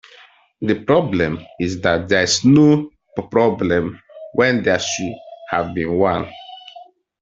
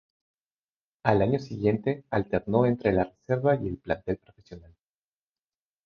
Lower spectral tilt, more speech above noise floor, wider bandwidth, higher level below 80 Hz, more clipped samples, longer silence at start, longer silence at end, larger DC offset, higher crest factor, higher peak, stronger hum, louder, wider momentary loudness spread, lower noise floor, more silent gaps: second, -5 dB/octave vs -9 dB/octave; second, 31 dB vs over 64 dB; first, 8 kHz vs 6.8 kHz; about the same, -52 dBFS vs -52 dBFS; neither; second, 0.6 s vs 1.05 s; second, 0.4 s vs 1.25 s; neither; second, 16 dB vs 22 dB; first, -2 dBFS vs -6 dBFS; neither; first, -18 LUFS vs -27 LUFS; first, 17 LU vs 7 LU; second, -48 dBFS vs under -90 dBFS; neither